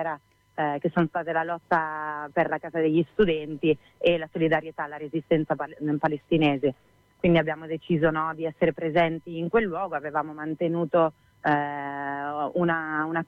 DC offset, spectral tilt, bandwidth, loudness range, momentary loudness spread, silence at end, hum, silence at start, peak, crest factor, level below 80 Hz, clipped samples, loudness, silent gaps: under 0.1%; -8.5 dB/octave; 5.4 kHz; 2 LU; 8 LU; 0.05 s; none; 0 s; -10 dBFS; 16 dB; -56 dBFS; under 0.1%; -26 LUFS; none